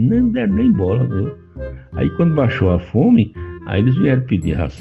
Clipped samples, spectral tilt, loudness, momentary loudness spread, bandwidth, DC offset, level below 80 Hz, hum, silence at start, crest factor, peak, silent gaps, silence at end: under 0.1%; -9.5 dB/octave; -17 LUFS; 14 LU; 8.2 kHz; under 0.1%; -34 dBFS; none; 0 s; 14 dB; -2 dBFS; none; 0 s